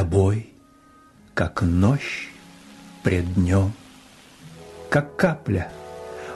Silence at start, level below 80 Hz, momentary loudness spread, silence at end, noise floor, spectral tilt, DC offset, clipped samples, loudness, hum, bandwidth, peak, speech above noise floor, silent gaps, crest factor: 0 s; -42 dBFS; 24 LU; 0 s; -52 dBFS; -7.5 dB/octave; under 0.1%; under 0.1%; -23 LUFS; none; 12 kHz; -6 dBFS; 31 dB; none; 18 dB